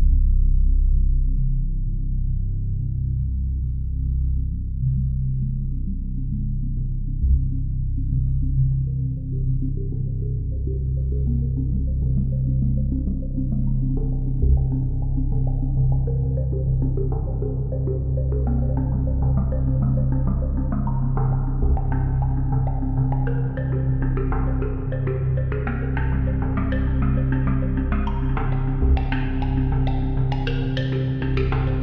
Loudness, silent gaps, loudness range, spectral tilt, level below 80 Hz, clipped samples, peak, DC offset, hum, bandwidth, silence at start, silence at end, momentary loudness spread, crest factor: -24 LUFS; none; 3 LU; -9 dB/octave; -22 dBFS; under 0.1%; -8 dBFS; 0.2%; none; 4.3 kHz; 0 s; 0 s; 5 LU; 14 dB